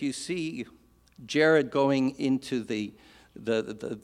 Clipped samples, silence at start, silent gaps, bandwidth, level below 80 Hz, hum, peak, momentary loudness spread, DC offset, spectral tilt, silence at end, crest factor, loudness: under 0.1%; 0 s; none; 12.5 kHz; -66 dBFS; none; -10 dBFS; 16 LU; under 0.1%; -5 dB/octave; 0.05 s; 20 dB; -28 LUFS